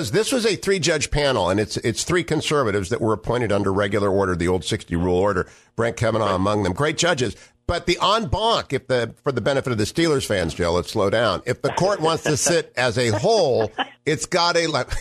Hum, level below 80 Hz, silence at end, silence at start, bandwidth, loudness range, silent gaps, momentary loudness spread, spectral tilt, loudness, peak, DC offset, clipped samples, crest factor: none; -42 dBFS; 0 s; 0 s; 13.5 kHz; 2 LU; none; 5 LU; -4.5 dB/octave; -21 LUFS; -4 dBFS; under 0.1%; under 0.1%; 16 dB